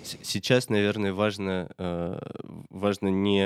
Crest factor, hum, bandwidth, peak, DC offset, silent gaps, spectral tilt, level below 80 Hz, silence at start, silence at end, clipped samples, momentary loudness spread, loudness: 20 dB; none; 15.5 kHz; -8 dBFS; under 0.1%; none; -5.5 dB/octave; -60 dBFS; 0 s; 0 s; under 0.1%; 14 LU; -27 LUFS